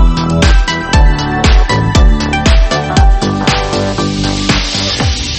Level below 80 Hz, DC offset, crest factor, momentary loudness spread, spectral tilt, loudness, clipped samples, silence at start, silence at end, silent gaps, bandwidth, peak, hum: -12 dBFS; under 0.1%; 10 dB; 4 LU; -5 dB/octave; -11 LUFS; under 0.1%; 0 s; 0 s; none; 8.8 kHz; 0 dBFS; none